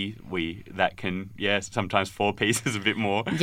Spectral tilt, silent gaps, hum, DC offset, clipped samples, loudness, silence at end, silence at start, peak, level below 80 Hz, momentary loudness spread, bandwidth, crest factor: -4 dB/octave; none; none; under 0.1%; under 0.1%; -27 LUFS; 0 s; 0 s; -4 dBFS; -56 dBFS; 7 LU; 16.5 kHz; 22 dB